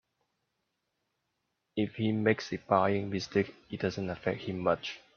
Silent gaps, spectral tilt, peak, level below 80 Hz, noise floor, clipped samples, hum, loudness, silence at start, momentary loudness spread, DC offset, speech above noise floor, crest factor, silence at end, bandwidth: none; -6.5 dB/octave; -10 dBFS; -66 dBFS; -82 dBFS; under 0.1%; none; -32 LUFS; 1.75 s; 7 LU; under 0.1%; 51 dB; 24 dB; 0.2 s; 7 kHz